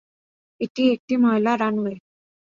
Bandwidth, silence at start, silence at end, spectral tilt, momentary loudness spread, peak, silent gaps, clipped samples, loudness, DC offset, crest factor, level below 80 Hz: 7.2 kHz; 0.6 s; 0.55 s; -6.5 dB/octave; 12 LU; -8 dBFS; 0.70-0.75 s, 1.00-1.08 s; under 0.1%; -22 LUFS; under 0.1%; 16 dB; -66 dBFS